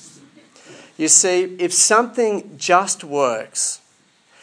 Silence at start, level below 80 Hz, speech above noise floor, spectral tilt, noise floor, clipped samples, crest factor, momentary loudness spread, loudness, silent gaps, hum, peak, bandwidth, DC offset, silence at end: 0.7 s; -84 dBFS; 39 dB; -1.5 dB/octave; -57 dBFS; under 0.1%; 20 dB; 10 LU; -17 LUFS; none; none; 0 dBFS; 10.5 kHz; under 0.1%; 0.65 s